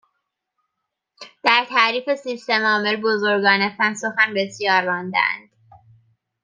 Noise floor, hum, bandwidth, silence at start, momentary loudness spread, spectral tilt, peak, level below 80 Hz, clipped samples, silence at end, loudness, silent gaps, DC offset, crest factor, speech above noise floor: -80 dBFS; none; 9.8 kHz; 1.2 s; 6 LU; -3.5 dB/octave; 0 dBFS; -74 dBFS; under 0.1%; 1.05 s; -19 LUFS; none; under 0.1%; 22 dB; 60 dB